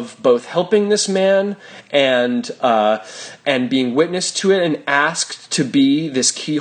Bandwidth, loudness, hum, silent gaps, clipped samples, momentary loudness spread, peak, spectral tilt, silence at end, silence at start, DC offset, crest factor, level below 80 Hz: 10 kHz; -17 LUFS; none; none; under 0.1%; 5 LU; -2 dBFS; -3.5 dB/octave; 0 s; 0 s; under 0.1%; 16 dB; -66 dBFS